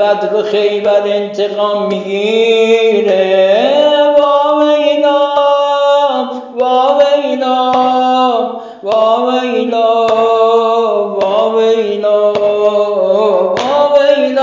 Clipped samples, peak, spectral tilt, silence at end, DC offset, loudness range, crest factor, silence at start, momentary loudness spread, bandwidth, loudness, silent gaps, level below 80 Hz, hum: under 0.1%; 0 dBFS; -5 dB/octave; 0 s; under 0.1%; 2 LU; 10 dB; 0 s; 5 LU; 7.6 kHz; -11 LUFS; none; -62 dBFS; none